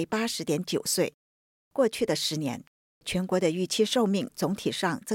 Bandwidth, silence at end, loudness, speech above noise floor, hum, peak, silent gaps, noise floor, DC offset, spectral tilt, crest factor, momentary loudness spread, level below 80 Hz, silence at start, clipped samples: 17 kHz; 0 s; -28 LUFS; over 62 dB; none; -12 dBFS; 1.14-1.71 s, 2.67-3.01 s; under -90 dBFS; under 0.1%; -4 dB/octave; 16 dB; 7 LU; -62 dBFS; 0 s; under 0.1%